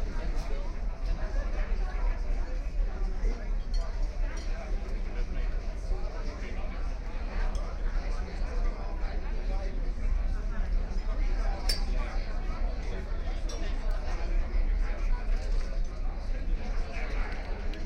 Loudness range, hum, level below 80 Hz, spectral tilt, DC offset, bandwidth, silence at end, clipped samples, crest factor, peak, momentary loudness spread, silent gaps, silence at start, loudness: 3 LU; none; -30 dBFS; -5.5 dB/octave; under 0.1%; 10.5 kHz; 0 s; under 0.1%; 12 dB; -16 dBFS; 4 LU; none; 0 s; -36 LUFS